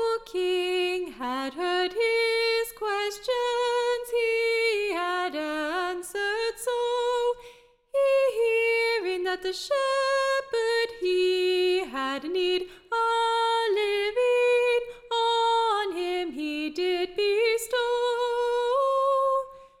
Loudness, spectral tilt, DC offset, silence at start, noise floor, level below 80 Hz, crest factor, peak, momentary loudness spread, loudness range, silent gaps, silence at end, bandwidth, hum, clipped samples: -26 LUFS; -1.5 dB/octave; under 0.1%; 0 s; -52 dBFS; -62 dBFS; 10 dB; -14 dBFS; 7 LU; 2 LU; none; 0.15 s; 16 kHz; none; under 0.1%